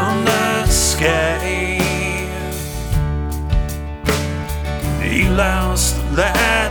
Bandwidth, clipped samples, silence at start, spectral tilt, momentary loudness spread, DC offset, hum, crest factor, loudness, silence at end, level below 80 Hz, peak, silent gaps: over 20 kHz; under 0.1%; 0 s; -4 dB/octave; 9 LU; under 0.1%; none; 16 dB; -18 LUFS; 0 s; -24 dBFS; -2 dBFS; none